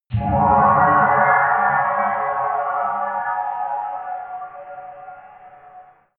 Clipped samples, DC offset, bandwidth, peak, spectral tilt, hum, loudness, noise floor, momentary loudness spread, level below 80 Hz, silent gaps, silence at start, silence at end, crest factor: under 0.1%; under 0.1%; 3.9 kHz; -2 dBFS; -11.5 dB/octave; none; -18 LUFS; -46 dBFS; 21 LU; -44 dBFS; none; 0.1 s; 0.35 s; 18 dB